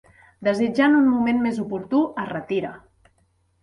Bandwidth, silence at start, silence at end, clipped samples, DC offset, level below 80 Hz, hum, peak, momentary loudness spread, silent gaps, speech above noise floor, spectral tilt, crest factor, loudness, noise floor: 11 kHz; 0.4 s; 0.85 s; under 0.1%; under 0.1%; -60 dBFS; none; -6 dBFS; 11 LU; none; 44 dB; -7 dB/octave; 16 dB; -22 LUFS; -65 dBFS